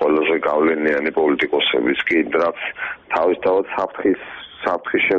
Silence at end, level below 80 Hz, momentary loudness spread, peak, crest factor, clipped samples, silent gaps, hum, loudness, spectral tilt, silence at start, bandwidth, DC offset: 0 s; -56 dBFS; 8 LU; -6 dBFS; 14 dB; under 0.1%; none; none; -19 LUFS; -6 dB/octave; 0 s; 6.8 kHz; under 0.1%